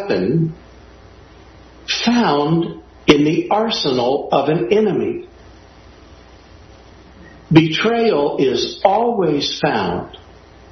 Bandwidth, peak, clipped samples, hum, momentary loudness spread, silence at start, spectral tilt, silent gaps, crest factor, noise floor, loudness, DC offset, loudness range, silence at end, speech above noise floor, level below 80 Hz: 6.4 kHz; 0 dBFS; under 0.1%; none; 9 LU; 0 s; -6 dB/octave; none; 18 dB; -43 dBFS; -17 LUFS; under 0.1%; 4 LU; 0.55 s; 27 dB; -48 dBFS